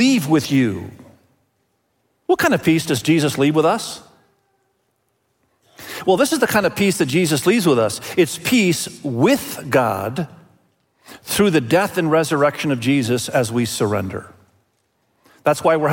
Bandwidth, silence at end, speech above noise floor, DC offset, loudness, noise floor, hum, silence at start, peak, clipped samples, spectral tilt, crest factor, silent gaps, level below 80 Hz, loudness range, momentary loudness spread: 17 kHz; 0 s; 50 dB; under 0.1%; -18 LUFS; -68 dBFS; none; 0 s; -4 dBFS; under 0.1%; -5 dB/octave; 16 dB; none; -58 dBFS; 4 LU; 11 LU